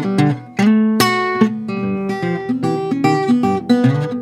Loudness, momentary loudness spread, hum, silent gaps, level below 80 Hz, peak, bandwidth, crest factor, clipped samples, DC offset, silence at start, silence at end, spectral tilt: -16 LUFS; 7 LU; none; none; -56 dBFS; 0 dBFS; 16 kHz; 16 dB; under 0.1%; under 0.1%; 0 s; 0 s; -6.5 dB/octave